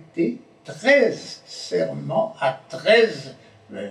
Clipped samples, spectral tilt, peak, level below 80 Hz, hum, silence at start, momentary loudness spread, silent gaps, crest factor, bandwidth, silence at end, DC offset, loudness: under 0.1%; -4.5 dB/octave; -4 dBFS; -78 dBFS; none; 0 s; 20 LU; none; 18 dB; 10.5 kHz; 0 s; under 0.1%; -21 LUFS